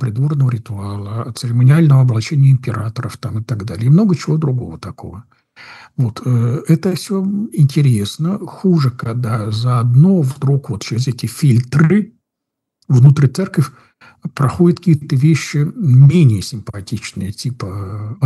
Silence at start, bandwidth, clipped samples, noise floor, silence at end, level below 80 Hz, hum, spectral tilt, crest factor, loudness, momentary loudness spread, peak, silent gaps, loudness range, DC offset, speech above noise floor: 0 s; 12.5 kHz; under 0.1%; -79 dBFS; 0 s; -52 dBFS; none; -7.5 dB/octave; 14 dB; -15 LUFS; 15 LU; 0 dBFS; none; 4 LU; under 0.1%; 65 dB